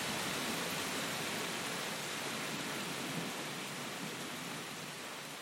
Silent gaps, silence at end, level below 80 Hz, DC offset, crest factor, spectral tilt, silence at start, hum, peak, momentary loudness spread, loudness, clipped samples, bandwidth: none; 0 s; -74 dBFS; under 0.1%; 16 dB; -2.5 dB/octave; 0 s; none; -24 dBFS; 6 LU; -39 LUFS; under 0.1%; 16.5 kHz